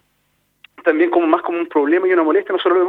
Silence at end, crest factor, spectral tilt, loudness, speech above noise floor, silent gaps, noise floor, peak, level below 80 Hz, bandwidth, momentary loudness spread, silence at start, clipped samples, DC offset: 0 s; 16 dB; -6 dB/octave; -16 LUFS; 49 dB; none; -65 dBFS; 0 dBFS; -70 dBFS; 4 kHz; 4 LU; 0.8 s; under 0.1%; under 0.1%